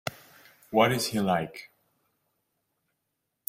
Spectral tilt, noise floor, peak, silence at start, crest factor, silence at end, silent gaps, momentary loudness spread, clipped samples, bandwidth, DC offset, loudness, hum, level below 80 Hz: -4.5 dB/octave; -81 dBFS; -8 dBFS; 0.05 s; 24 dB; 1.8 s; none; 15 LU; under 0.1%; 16 kHz; under 0.1%; -26 LUFS; none; -68 dBFS